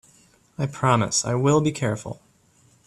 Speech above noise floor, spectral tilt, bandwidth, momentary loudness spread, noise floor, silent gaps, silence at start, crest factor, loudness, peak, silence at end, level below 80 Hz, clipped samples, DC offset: 37 dB; -5 dB/octave; 12.5 kHz; 19 LU; -59 dBFS; none; 0.6 s; 20 dB; -22 LUFS; -6 dBFS; 0.7 s; -58 dBFS; under 0.1%; under 0.1%